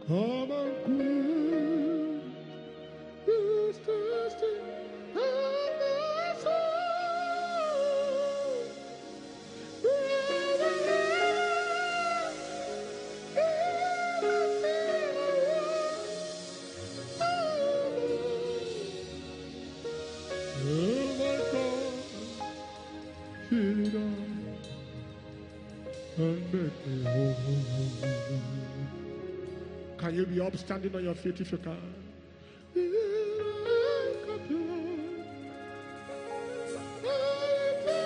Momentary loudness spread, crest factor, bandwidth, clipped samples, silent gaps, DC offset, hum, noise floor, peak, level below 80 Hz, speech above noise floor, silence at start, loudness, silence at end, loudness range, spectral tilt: 15 LU; 16 dB; 10 kHz; under 0.1%; none; under 0.1%; none; -52 dBFS; -16 dBFS; -62 dBFS; 19 dB; 0 s; -32 LUFS; 0 s; 6 LU; -6 dB/octave